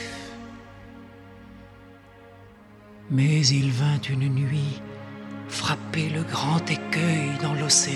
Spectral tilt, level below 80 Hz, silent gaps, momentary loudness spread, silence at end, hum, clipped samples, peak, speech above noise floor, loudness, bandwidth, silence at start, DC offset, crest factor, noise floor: -4 dB/octave; -58 dBFS; none; 25 LU; 0 s; none; under 0.1%; -6 dBFS; 25 dB; -24 LUFS; 12.5 kHz; 0 s; under 0.1%; 20 dB; -49 dBFS